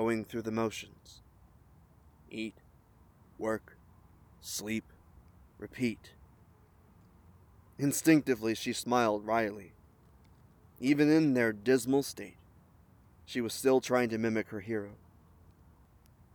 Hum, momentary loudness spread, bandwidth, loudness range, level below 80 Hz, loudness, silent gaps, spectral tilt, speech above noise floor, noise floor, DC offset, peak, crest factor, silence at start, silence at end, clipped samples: none; 20 LU; over 20 kHz; 12 LU; -64 dBFS; -31 LUFS; none; -5 dB/octave; 31 dB; -62 dBFS; under 0.1%; -12 dBFS; 22 dB; 0 s; 1.4 s; under 0.1%